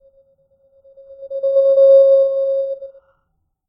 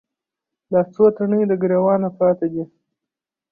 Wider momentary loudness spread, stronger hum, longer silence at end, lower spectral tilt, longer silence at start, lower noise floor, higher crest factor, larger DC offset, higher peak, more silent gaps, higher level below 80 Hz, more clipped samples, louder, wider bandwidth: first, 18 LU vs 9 LU; neither; about the same, 0.8 s vs 0.85 s; second, -5 dB/octave vs -12.5 dB/octave; first, 1.1 s vs 0.7 s; second, -69 dBFS vs -86 dBFS; about the same, 14 dB vs 16 dB; neither; about the same, -4 dBFS vs -4 dBFS; neither; second, -68 dBFS vs -62 dBFS; neither; first, -13 LUFS vs -18 LUFS; first, 4.9 kHz vs 2.8 kHz